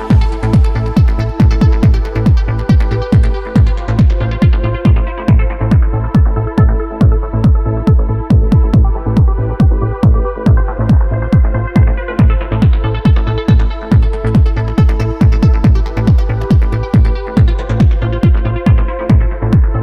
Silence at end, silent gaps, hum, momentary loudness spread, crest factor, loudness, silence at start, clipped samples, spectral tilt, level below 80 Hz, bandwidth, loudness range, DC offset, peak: 0 s; none; none; 3 LU; 10 dB; -12 LUFS; 0 s; under 0.1%; -9 dB/octave; -12 dBFS; 6.2 kHz; 0 LU; under 0.1%; 0 dBFS